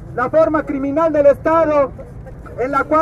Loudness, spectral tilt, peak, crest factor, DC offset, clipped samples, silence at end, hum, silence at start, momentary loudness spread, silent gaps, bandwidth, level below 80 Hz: -16 LUFS; -8 dB/octave; -2 dBFS; 14 dB; under 0.1%; under 0.1%; 0 s; none; 0 s; 21 LU; none; 7.6 kHz; -38 dBFS